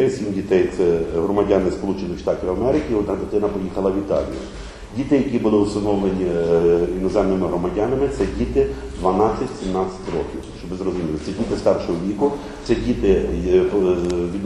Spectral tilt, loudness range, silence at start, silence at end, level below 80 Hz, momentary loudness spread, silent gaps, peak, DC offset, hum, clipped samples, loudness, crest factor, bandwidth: -7.5 dB/octave; 4 LU; 0 s; 0 s; -36 dBFS; 8 LU; none; -4 dBFS; under 0.1%; none; under 0.1%; -20 LUFS; 16 dB; 11 kHz